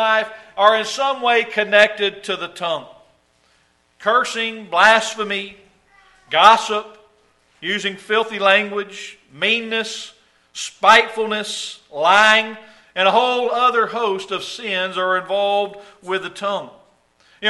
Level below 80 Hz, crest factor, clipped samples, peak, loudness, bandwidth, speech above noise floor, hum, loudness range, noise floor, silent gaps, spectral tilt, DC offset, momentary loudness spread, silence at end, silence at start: -64 dBFS; 20 dB; under 0.1%; 0 dBFS; -17 LUFS; 11.5 kHz; 42 dB; none; 4 LU; -60 dBFS; none; -2 dB/octave; under 0.1%; 16 LU; 0 s; 0 s